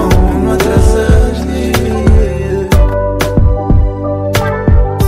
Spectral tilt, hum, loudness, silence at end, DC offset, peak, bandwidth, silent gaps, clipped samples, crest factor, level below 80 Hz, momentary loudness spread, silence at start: -6.5 dB/octave; none; -12 LUFS; 0 s; under 0.1%; 0 dBFS; 16 kHz; none; under 0.1%; 10 dB; -12 dBFS; 5 LU; 0 s